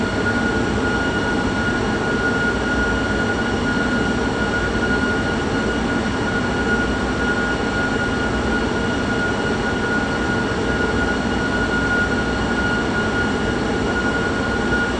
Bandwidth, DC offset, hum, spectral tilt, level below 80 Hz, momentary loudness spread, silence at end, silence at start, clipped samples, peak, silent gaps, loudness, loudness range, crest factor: 9.8 kHz; under 0.1%; none; -5.5 dB/octave; -32 dBFS; 1 LU; 0 s; 0 s; under 0.1%; -6 dBFS; none; -20 LUFS; 1 LU; 14 dB